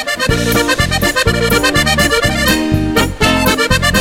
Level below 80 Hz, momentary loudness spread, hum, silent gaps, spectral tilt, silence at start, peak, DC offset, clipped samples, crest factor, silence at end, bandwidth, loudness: -24 dBFS; 3 LU; none; none; -4 dB/octave; 0 s; 0 dBFS; under 0.1%; under 0.1%; 12 dB; 0 s; 17 kHz; -12 LUFS